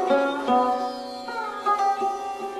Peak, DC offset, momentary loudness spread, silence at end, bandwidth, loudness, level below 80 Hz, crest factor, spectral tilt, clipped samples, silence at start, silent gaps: -8 dBFS; under 0.1%; 9 LU; 0 s; 13 kHz; -25 LUFS; -64 dBFS; 16 dB; -3.5 dB/octave; under 0.1%; 0 s; none